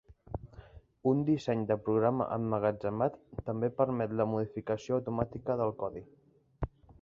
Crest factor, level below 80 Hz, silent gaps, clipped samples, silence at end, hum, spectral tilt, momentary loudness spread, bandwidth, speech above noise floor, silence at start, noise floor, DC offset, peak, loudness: 20 dB; -54 dBFS; none; under 0.1%; 0.1 s; none; -9 dB/octave; 13 LU; 7.6 kHz; 22 dB; 0.1 s; -54 dBFS; under 0.1%; -12 dBFS; -33 LUFS